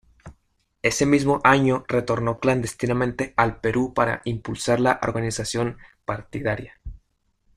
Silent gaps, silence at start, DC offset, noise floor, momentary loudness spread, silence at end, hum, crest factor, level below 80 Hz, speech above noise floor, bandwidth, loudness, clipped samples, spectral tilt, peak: none; 0.25 s; under 0.1%; -68 dBFS; 13 LU; 0.6 s; none; 20 dB; -46 dBFS; 46 dB; 14.5 kHz; -23 LUFS; under 0.1%; -5.5 dB/octave; -2 dBFS